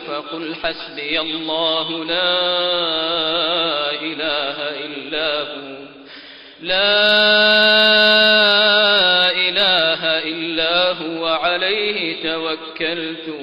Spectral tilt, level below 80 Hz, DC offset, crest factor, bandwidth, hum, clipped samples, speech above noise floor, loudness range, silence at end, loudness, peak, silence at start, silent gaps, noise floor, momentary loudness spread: -4 dB/octave; -54 dBFS; under 0.1%; 12 dB; 13 kHz; none; under 0.1%; 21 dB; 9 LU; 0 s; -15 LUFS; -6 dBFS; 0 s; none; -39 dBFS; 14 LU